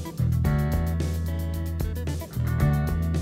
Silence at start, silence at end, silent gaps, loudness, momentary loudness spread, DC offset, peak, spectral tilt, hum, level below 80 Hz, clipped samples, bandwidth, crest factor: 0 s; 0 s; none; -27 LUFS; 6 LU; under 0.1%; -10 dBFS; -7.5 dB/octave; none; -30 dBFS; under 0.1%; 16 kHz; 14 dB